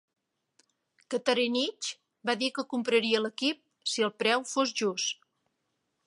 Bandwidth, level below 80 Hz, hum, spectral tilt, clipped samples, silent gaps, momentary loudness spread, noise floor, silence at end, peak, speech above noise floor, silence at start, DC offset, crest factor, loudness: 11.5 kHz; -84 dBFS; none; -2.5 dB/octave; under 0.1%; none; 9 LU; -80 dBFS; 0.95 s; -8 dBFS; 51 dB; 1.1 s; under 0.1%; 24 dB; -29 LUFS